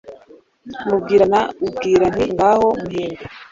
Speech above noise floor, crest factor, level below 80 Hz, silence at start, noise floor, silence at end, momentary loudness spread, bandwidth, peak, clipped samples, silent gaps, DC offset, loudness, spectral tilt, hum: 31 dB; 16 dB; -46 dBFS; 0.05 s; -47 dBFS; 0.1 s; 14 LU; 7.6 kHz; -2 dBFS; under 0.1%; none; under 0.1%; -17 LUFS; -6 dB/octave; none